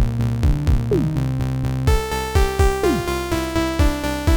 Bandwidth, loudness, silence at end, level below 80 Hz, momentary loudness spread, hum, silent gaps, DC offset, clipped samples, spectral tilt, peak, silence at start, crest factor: over 20 kHz; -20 LUFS; 0 s; -22 dBFS; 4 LU; none; none; under 0.1%; under 0.1%; -6 dB/octave; -4 dBFS; 0 s; 14 dB